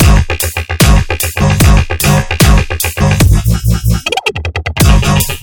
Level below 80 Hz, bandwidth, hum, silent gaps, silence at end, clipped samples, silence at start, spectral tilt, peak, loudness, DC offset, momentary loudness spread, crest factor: -14 dBFS; 19.5 kHz; none; none; 0 s; 0.8%; 0 s; -4.5 dB/octave; 0 dBFS; -11 LUFS; under 0.1%; 6 LU; 10 dB